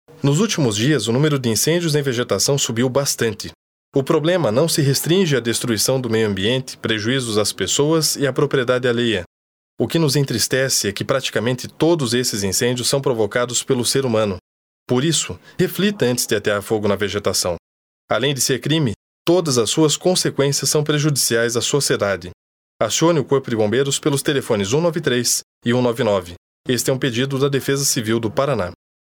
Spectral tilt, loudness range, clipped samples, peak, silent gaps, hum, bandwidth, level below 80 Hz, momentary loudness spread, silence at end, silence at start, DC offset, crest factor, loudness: -4 dB/octave; 2 LU; under 0.1%; -2 dBFS; 3.55-3.92 s, 9.26-9.77 s, 14.41-14.86 s, 17.59-18.08 s, 18.96-19.25 s, 22.34-22.79 s, 25.43-25.61 s, 26.37-26.64 s; none; over 20 kHz; -56 dBFS; 6 LU; 0.35 s; 0.25 s; under 0.1%; 16 dB; -18 LUFS